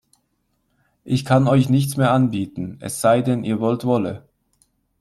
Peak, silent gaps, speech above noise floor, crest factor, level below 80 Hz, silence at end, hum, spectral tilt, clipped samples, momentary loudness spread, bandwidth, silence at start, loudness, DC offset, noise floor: -2 dBFS; none; 51 dB; 18 dB; -56 dBFS; 0.8 s; none; -6.5 dB/octave; under 0.1%; 12 LU; 14 kHz; 1.05 s; -19 LUFS; under 0.1%; -69 dBFS